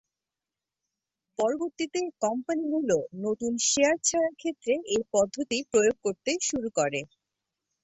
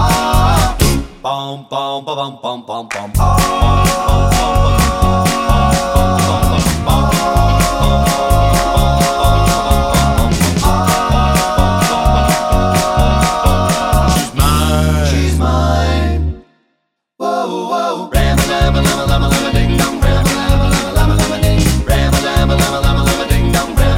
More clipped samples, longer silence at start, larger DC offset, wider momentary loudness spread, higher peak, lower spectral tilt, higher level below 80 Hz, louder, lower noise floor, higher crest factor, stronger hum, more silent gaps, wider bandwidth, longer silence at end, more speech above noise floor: neither; first, 1.4 s vs 0 s; neither; about the same, 8 LU vs 7 LU; second, -10 dBFS vs 0 dBFS; second, -2.5 dB/octave vs -5 dB/octave; second, -66 dBFS vs -16 dBFS; second, -27 LUFS vs -13 LUFS; first, -90 dBFS vs -68 dBFS; first, 18 dB vs 12 dB; neither; neither; second, 8.4 kHz vs 17 kHz; first, 0.8 s vs 0 s; first, 62 dB vs 53 dB